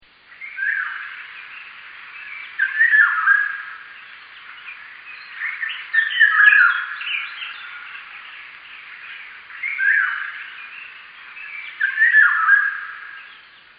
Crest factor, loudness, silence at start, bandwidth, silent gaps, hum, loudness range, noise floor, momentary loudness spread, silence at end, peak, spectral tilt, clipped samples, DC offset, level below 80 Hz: 20 dB; -16 LUFS; 0.3 s; 5 kHz; none; none; 7 LU; -45 dBFS; 24 LU; 0.45 s; -2 dBFS; 7 dB/octave; under 0.1%; under 0.1%; -76 dBFS